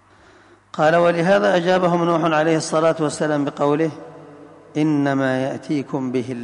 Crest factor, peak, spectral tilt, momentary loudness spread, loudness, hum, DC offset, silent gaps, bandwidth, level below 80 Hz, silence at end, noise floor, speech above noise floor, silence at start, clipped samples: 14 dB; -6 dBFS; -6 dB/octave; 8 LU; -19 LUFS; none; under 0.1%; none; 11 kHz; -64 dBFS; 0 s; -50 dBFS; 32 dB; 0.75 s; under 0.1%